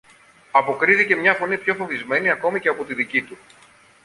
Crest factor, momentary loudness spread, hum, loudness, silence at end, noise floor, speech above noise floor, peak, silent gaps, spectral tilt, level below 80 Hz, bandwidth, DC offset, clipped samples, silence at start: 20 dB; 8 LU; none; -19 LUFS; 0.7 s; -51 dBFS; 31 dB; -2 dBFS; none; -5 dB/octave; -66 dBFS; 11.5 kHz; under 0.1%; under 0.1%; 0.55 s